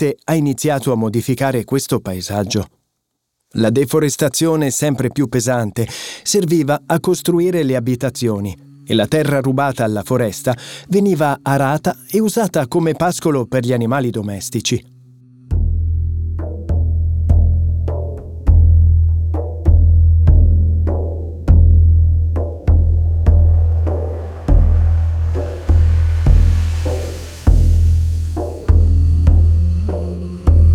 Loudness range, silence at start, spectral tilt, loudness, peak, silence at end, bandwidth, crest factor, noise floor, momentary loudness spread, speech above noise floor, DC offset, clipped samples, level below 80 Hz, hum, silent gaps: 5 LU; 0 s; -6.5 dB/octave; -16 LUFS; -2 dBFS; 0 s; 16 kHz; 14 dB; -73 dBFS; 9 LU; 57 dB; 0.2%; under 0.1%; -20 dBFS; none; none